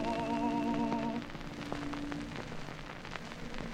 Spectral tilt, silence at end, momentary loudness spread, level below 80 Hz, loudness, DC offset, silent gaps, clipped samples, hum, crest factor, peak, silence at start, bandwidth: -6 dB/octave; 0 s; 11 LU; -50 dBFS; -38 LUFS; under 0.1%; none; under 0.1%; none; 18 dB; -20 dBFS; 0 s; 15 kHz